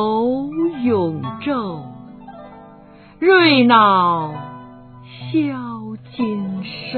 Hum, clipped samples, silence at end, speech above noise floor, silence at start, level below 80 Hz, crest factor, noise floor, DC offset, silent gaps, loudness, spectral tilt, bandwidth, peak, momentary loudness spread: 50 Hz at -50 dBFS; under 0.1%; 0 s; 27 dB; 0 s; -56 dBFS; 18 dB; -43 dBFS; under 0.1%; none; -17 LUFS; -9 dB/octave; 4.5 kHz; 0 dBFS; 26 LU